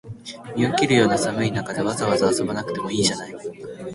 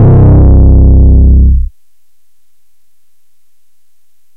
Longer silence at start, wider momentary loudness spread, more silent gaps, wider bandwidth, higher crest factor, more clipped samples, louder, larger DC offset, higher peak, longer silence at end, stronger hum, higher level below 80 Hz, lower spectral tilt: about the same, 0.05 s vs 0 s; first, 17 LU vs 8 LU; neither; first, 11.5 kHz vs 1.8 kHz; first, 20 dB vs 6 dB; neither; second, -21 LUFS vs -6 LUFS; neither; about the same, -2 dBFS vs 0 dBFS; second, 0 s vs 2.7 s; neither; second, -54 dBFS vs -8 dBFS; second, -4.5 dB/octave vs -13 dB/octave